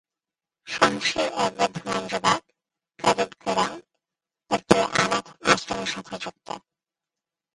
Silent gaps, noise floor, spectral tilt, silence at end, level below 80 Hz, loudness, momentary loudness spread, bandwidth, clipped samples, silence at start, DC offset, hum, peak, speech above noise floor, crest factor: none; -90 dBFS; -3 dB/octave; 0.95 s; -58 dBFS; -24 LUFS; 14 LU; 11.5 kHz; under 0.1%; 0.65 s; under 0.1%; none; 0 dBFS; 64 dB; 26 dB